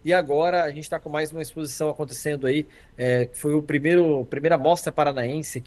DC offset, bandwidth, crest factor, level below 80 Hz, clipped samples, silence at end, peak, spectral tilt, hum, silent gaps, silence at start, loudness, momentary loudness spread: under 0.1%; 12.5 kHz; 18 dB; -56 dBFS; under 0.1%; 0.05 s; -6 dBFS; -5.5 dB/octave; none; none; 0.05 s; -24 LUFS; 9 LU